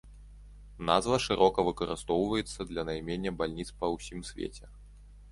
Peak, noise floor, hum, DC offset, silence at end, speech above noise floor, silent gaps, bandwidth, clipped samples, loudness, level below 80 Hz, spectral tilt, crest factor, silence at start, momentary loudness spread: -8 dBFS; -51 dBFS; 50 Hz at -50 dBFS; under 0.1%; 0 s; 21 dB; none; 11.5 kHz; under 0.1%; -31 LUFS; -50 dBFS; -5 dB/octave; 24 dB; 0.05 s; 14 LU